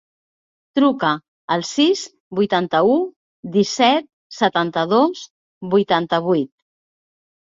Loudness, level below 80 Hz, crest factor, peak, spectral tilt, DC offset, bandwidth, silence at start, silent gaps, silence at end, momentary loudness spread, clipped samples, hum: -19 LUFS; -64 dBFS; 18 dB; -2 dBFS; -5 dB/octave; under 0.1%; 7.8 kHz; 0.75 s; 1.28-1.48 s, 2.20-2.31 s, 3.16-3.43 s, 4.13-4.30 s, 5.30-5.61 s; 1.1 s; 11 LU; under 0.1%; none